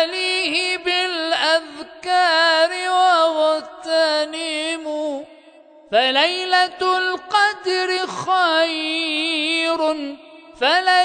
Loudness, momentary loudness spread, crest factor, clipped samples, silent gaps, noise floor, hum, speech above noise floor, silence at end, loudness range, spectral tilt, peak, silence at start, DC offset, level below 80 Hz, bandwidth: -18 LUFS; 9 LU; 16 dB; under 0.1%; none; -47 dBFS; none; 28 dB; 0 s; 3 LU; -1.5 dB/octave; -4 dBFS; 0 s; under 0.1%; -66 dBFS; 9.4 kHz